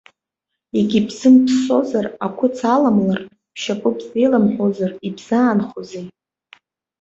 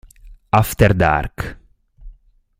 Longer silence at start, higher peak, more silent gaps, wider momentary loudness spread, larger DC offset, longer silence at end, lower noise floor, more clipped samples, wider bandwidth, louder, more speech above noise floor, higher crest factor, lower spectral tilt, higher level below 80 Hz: first, 0.75 s vs 0.25 s; about the same, -2 dBFS vs 0 dBFS; neither; about the same, 16 LU vs 16 LU; neither; first, 0.9 s vs 0.5 s; first, -81 dBFS vs -48 dBFS; neither; second, 8 kHz vs 16 kHz; about the same, -17 LUFS vs -17 LUFS; first, 64 dB vs 32 dB; about the same, 16 dB vs 20 dB; about the same, -6.5 dB/octave vs -6.5 dB/octave; second, -60 dBFS vs -32 dBFS